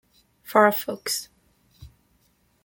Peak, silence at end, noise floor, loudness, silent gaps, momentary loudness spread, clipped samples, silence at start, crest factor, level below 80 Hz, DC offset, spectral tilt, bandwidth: -2 dBFS; 0.8 s; -65 dBFS; -22 LUFS; none; 11 LU; under 0.1%; 0.5 s; 24 dB; -60 dBFS; under 0.1%; -3 dB/octave; 17 kHz